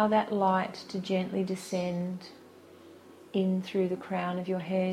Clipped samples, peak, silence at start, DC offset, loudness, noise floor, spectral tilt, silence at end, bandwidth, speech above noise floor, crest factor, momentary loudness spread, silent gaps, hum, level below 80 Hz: under 0.1%; -12 dBFS; 0 s; under 0.1%; -31 LUFS; -53 dBFS; -6.5 dB/octave; 0 s; 13 kHz; 23 dB; 18 dB; 9 LU; none; none; -72 dBFS